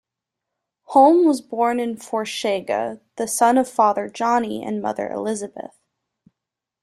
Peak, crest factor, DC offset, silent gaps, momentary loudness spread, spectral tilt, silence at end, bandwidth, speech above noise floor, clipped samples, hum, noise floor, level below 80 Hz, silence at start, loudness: -2 dBFS; 20 dB; under 0.1%; none; 14 LU; -4 dB/octave; 1.2 s; 13 kHz; 65 dB; under 0.1%; none; -85 dBFS; -68 dBFS; 0.9 s; -20 LUFS